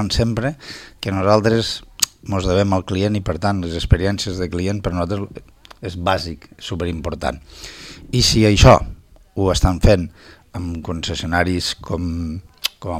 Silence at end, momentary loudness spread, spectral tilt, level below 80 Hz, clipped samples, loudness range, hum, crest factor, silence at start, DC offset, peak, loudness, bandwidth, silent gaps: 0 s; 17 LU; -5 dB/octave; -28 dBFS; under 0.1%; 8 LU; none; 18 dB; 0 s; under 0.1%; 0 dBFS; -19 LUFS; 16.5 kHz; none